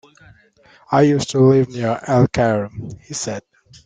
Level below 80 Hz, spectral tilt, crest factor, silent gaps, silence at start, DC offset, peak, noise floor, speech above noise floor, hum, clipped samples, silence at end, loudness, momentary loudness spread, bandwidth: -50 dBFS; -6.5 dB/octave; 16 dB; none; 0.9 s; under 0.1%; -2 dBFS; -48 dBFS; 31 dB; none; under 0.1%; 0.45 s; -17 LUFS; 15 LU; 9.4 kHz